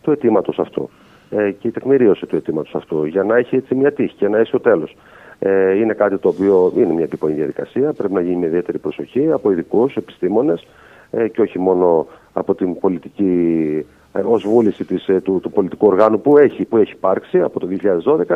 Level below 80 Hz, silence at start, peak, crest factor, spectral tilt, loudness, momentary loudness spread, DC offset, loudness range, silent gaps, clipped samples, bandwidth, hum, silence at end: -58 dBFS; 0.05 s; 0 dBFS; 16 dB; -9 dB/octave; -17 LUFS; 9 LU; under 0.1%; 3 LU; none; under 0.1%; 4.5 kHz; none; 0 s